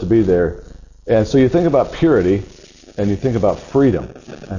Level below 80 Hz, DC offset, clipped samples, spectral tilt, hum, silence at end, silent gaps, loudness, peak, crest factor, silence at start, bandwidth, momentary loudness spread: -36 dBFS; under 0.1%; under 0.1%; -8 dB/octave; none; 0 s; none; -16 LUFS; -4 dBFS; 14 dB; 0 s; 7.4 kHz; 20 LU